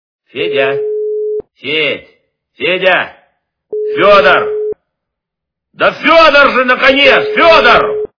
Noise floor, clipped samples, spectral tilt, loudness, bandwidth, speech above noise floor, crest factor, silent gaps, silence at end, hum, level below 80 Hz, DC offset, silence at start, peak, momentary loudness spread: -78 dBFS; 1%; -4.5 dB/octave; -9 LUFS; 5.4 kHz; 70 dB; 12 dB; none; 0.15 s; none; -42 dBFS; under 0.1%; 0.35 s; 0 dBFS; 15 LU